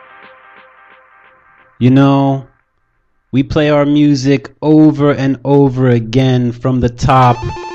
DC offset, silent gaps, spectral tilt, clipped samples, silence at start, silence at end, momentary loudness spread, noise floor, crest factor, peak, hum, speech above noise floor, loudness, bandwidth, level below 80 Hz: under 0.1%; none; -8 dB/octave; under 0.1%; 1.8 s; 0 s; 6 LU; -60 dBFS; 12 dB; 0 dBFS; none; 49 dB; -12 LUFS; 7.8 kHz; -36 dBFS